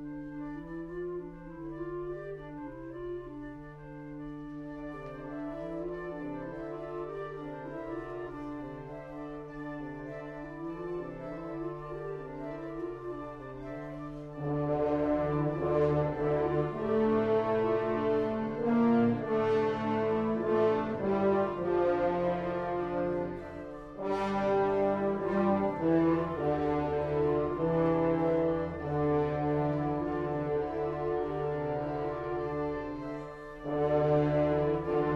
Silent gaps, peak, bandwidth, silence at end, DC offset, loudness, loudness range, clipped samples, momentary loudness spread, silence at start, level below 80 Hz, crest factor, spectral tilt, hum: none; -16 dBFS; 7.2 kHz; 0 s; under 0.1%; -32 LUFS; 12 LU; under 0.1%; 14 LU; 0 s; -54 dBFS; 16 dB; -9 dB/octave; none